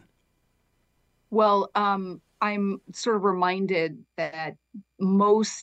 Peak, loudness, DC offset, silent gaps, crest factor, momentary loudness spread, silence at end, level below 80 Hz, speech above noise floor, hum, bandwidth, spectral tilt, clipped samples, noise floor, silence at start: -8 dBFS; -25 LUFS; under 0.1%; none; 18 dB; 11 LU; 0 s; -74 dBFS; 45 dB; none; 9 kHz; -5.5 dB/octave; under 0.1%; -70 dBFS; 1.3 s